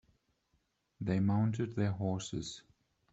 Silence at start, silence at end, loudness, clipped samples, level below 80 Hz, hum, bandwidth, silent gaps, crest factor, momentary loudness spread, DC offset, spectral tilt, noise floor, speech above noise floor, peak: 1 s; 0.5 s; -35 LUFS; under 0.1%; -66 dBFS; none; 8 kHz; none; 16 dB; 11 LU; under 0.1%; -6.5 dB/octave; -78 dBFS; 45 dB; -20 dBFS